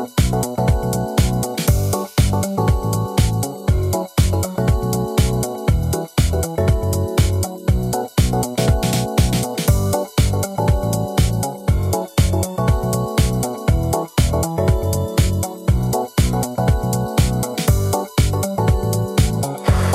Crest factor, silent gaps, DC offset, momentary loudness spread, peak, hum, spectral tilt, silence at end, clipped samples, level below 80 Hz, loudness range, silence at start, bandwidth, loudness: 16 dB; none; under 0.1%; 2 LU; -2 dBFS; none; -5.5 dB/octave; 0 s; under 0.1%; -24 dBFS; 1 LU; 0 s; 16 kHz; -19 LUFS